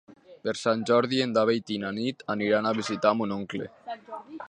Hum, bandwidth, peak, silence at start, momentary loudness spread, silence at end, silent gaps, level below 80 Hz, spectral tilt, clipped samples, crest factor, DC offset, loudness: none; 10 kHz; -6 dBFS; 0.3 s; 15 LU; 0.05 s; none; -70 dBFS; -5 dB/octave; under 0.1%; 20 dB; under 0.1%; -27 LUFS